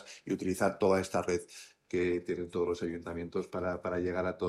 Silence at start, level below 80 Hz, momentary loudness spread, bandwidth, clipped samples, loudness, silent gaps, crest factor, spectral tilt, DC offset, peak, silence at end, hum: 0 s; -66 dBFS; 8 LU; 13.5 kHz; under 0.1%; -33 LUFS; none; 18 dB; -6 dB/octave; under 0.1%; -14 dBFS; 0 s; none